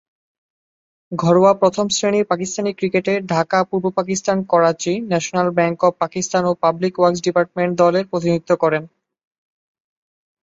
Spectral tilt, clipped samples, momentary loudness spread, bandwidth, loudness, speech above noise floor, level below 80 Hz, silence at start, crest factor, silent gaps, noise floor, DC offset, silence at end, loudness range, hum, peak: -5 dB/octave; under 0.1%; 5 LU; 8 kHz; -18 LUFS; over 73 dB; -60 dBFS; 1.1 s; 18 dB; none; under -90 dBFS; under 0.1%; 1.55 s; 2 LU; none; -2 dBFS